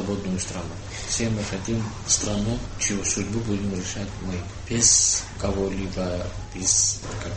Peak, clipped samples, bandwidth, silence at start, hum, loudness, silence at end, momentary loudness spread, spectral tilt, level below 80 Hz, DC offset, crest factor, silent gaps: -4 dBFS; under 0.1%; 8.8 kHz; 0 s; none; -24 LUFS; 0 s; 14 LU; -3 dB/octave; -38 dBFS; under 0.1%; 22 dB; none